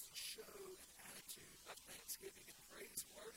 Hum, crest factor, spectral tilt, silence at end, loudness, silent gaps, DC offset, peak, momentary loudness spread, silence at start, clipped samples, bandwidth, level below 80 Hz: none; 22 dB; -0.5 dB/octave; 0 s; -53 LUFS; none; under 0.1%; -34 dBFS; 7 LU; 0 s; under 0.1%; 16.5 kHz; -78 dBFS